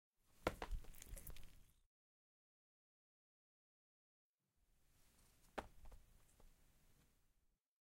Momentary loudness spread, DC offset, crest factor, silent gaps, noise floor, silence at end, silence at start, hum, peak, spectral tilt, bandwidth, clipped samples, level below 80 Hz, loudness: 20 LU; under 0.1%; 34 dB; 1.86-4.38 s; -83 dBFS; 0.9 s; 0.3 s; none; -22 dBFS; -4.5 dB/octave; 16.5 kHz; under 0.1%; -62 dBFS; -53 LUFS